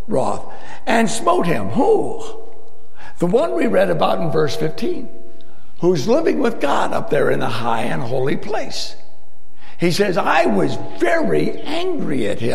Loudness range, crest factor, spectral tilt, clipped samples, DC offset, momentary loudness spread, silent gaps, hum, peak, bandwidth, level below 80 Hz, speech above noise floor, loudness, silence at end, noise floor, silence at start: 2 LU; 18 dB; -5.5 dB/octave; under 0.1%; 10%; 10 LU; none; none; 0 dBFS; 15 kHz; -48 dBFS; 34 dB; -19 LUFS; 0 s; -52 dBFS; 0 s